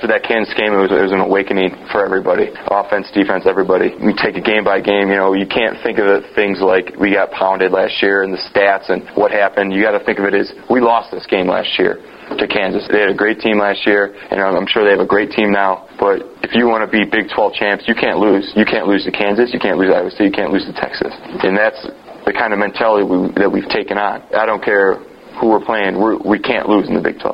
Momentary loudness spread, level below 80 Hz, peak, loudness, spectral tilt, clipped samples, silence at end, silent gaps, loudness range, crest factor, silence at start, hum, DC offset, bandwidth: 5 LU; -48 dBFS; 0 dBFS; -14 LUFS; -7.5 dB/octave; under 0.1%; 0 s; none; 2 LU; 14 dB; 0 s; none; under 0.1%; 5.6 kHz